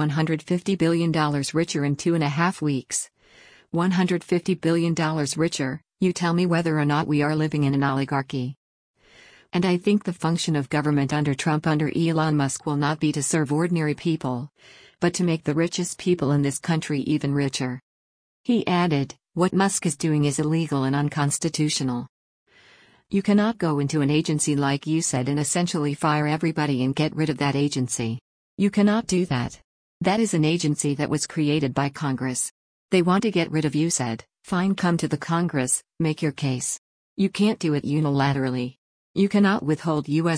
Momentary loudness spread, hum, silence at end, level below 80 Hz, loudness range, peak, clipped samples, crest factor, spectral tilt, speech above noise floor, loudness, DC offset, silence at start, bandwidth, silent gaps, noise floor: 6 LU; none; 0 s; -58 dBFS; 2 LU; -8 dBFS; under 0.1%; 16 dB; -5.5 dB/octave; 32 dB; -23 LUFS; under 0.1%; 0 s; 10.5 kHz; 8.57-8.94 s, 17.82-18.44 s, 22.09-22.46 s, 28.21-28.57 s, 29.64-30.00 s, 32.51-32.89 s, 36.78-37.16 s, 38.78-39.14 s; -55 dBFS